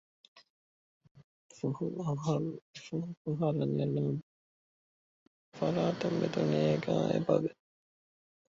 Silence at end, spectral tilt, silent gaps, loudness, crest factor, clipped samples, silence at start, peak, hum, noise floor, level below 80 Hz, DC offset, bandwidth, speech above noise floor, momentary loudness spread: 0.95 s; -7.5 dB/octave; 0.50-1.01 s, 1.11-1.15 s, 1.24-1.49 s, 2.62-2.74 s, 3.17-3.25 s, 4.23-5.52 s; -33 LUFS; 20 dB; under 0.1%; 0.35 s; -14 dBFS; none; under -90 dBFS; -70 dBFS; under 0.1%; 7.6 kHz; over 58 dB; 10 LU